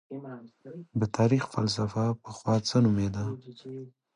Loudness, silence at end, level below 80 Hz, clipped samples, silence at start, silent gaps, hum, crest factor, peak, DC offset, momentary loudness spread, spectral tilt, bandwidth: -28 LUFS; 0.25 s; -56 dBFS; under 0.1%; 0.1 s; none; none; 16 dB; -12 dBFS; under 0.1%; 20 LU; -6.5 dB/octave; 10.5 kHz